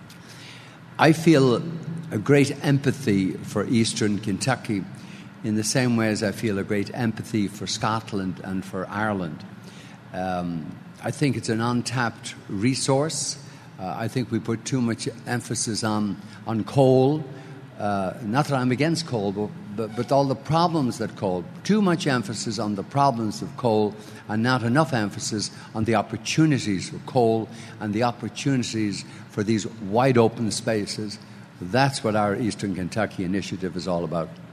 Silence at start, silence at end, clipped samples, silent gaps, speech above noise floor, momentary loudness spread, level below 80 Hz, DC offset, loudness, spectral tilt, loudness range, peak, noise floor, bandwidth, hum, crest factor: 0 s; 0 s; under 0.1%; none; 20 dB; 13 LU; -60 dBFS; under 0.1%; -24 LUFS; -5.5 dB/octave; 4 LU; 0 dBFS; -43 dBFS; 13.5 kHz; none; 24 dB